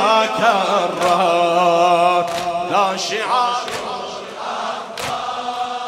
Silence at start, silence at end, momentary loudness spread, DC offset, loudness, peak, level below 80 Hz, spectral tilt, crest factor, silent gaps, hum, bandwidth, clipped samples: 0 s; 0 s; 11 LU; under 0.1%; -18 LUFS; -2 dBFS; -60 dBFS; -3.5 dB/octave; 16 dB; none; none; 15.5 kHz; under 0.1%